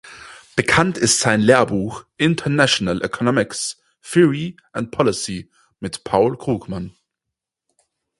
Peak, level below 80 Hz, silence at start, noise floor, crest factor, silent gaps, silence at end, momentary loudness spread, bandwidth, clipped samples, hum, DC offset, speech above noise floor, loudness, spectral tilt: 0 dBFS; -48 dBFS; 0.05 s; -83 dBFS; 20 dB; none; 1.3 s; 15 LU; 11.5 kHz; under 0.1%; none; under 0.1%; 65 dB; -18 LUFS; -4 dB/octave